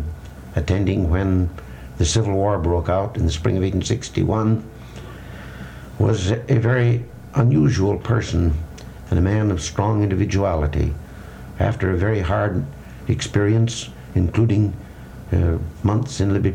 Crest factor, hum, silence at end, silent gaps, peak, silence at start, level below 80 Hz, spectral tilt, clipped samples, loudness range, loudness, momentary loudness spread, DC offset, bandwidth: 16 dB; none; 0 s; none; -4 dBFS; 0 s; -32 dBFS; -6.5 dB/octave; under 0.1%; 3 LU; -20 LUFS; 18 LU; under 0.1%; 10 kHz